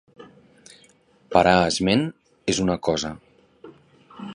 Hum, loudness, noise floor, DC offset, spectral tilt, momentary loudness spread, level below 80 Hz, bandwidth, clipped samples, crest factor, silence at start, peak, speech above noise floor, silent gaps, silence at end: none; -22 LUFS; -57 dBFS; under 0.1%; -4.5 dB/octave; 15 LU; -48 dBFS; 11.5 kHz; under 0.1%; 24 dB; 0.2 s; -2 dBFS; 37 dB; none; 0 s